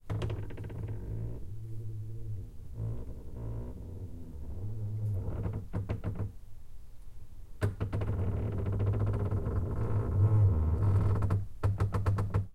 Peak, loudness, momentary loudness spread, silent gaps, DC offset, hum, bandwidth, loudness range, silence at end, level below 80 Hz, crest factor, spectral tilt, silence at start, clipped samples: -16 dBFS; -34 LUFS; 15 LU; none; under 0.1%; none; 5 kHz; 12 LU; 0 s; -42 dBFS; 16 dB; -9 dB/octave; 0.05 s; under 0.1%